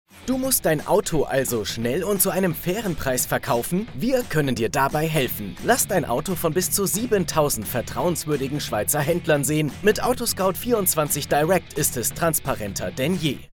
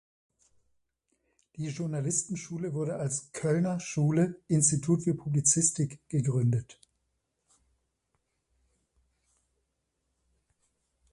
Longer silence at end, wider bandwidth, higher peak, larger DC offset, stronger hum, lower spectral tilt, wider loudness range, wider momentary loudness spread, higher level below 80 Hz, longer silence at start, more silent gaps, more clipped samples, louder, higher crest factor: second, 0.05 s vs 4.4 s; first, 17.5 kHz vs 11.5 kHz; first, -4 dBFS vs -10 dBFS; neither; neither; second, -4 dB/octave vs -5.5 dB/octave; second, 2 LU vs 8 LU; second, 5 LU vs 10 LU; first, -44 dBFS vs -66 dBFS; second, 0.15 s vs 1.55 s; neither; neither; first, -22 LUFS vs -29 LUFS; about the same, 18 dB vs 22 dB